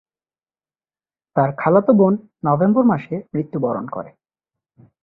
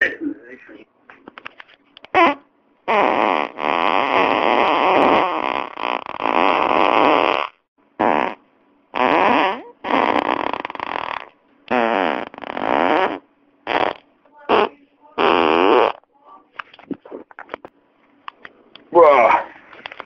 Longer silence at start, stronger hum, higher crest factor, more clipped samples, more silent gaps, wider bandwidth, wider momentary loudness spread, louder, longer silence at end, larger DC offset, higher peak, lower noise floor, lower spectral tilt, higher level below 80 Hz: first, 1.35 s vs 0 s; neither; about the same, 18 dB vs 20 dB; neither; second, none vs 7.68-7.76 s; second, 4 kHz vs 7.2 kHz; second, 11 LU vs 22 LU; about the same, -18 LUFS vs -18 LUFS; first, 0.95 s vs 0.25 s; neither; about the same, -2 dBFS vs 0 dBFS; first, under -90 dBFS vs -57 dBFS; first, -12.5 dB/octave vs -5.5 dB/octave; about the same, -60 dBFS vs -58 dBFS